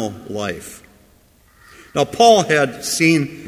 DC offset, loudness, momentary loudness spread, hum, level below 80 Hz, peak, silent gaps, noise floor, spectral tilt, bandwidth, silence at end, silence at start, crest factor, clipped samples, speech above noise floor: under 0.1%; -16 LUFS; 15 LU; none; -52 dBFS; 0 dBFS; none; -52 dBFS; -4 dB/octave; 16 kHz; 0 s; 0 s; 18 dB; under 0.1%; 36 dB